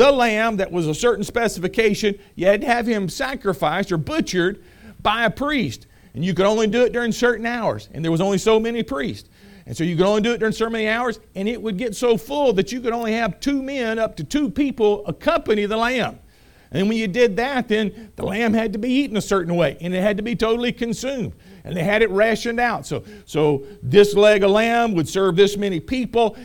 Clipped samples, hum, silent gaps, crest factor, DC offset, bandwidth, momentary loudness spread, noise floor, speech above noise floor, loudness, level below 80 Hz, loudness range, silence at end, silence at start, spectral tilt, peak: under 0.1%; none; none; 20 dB; under 0.1%; 18.5 kHz; 9 LU; -49 dBFS; 29 dB; -20 LUFS; -44 dBFS; 4 LU; 0 s; 0 s; -5 dB/octave; 0 dBFS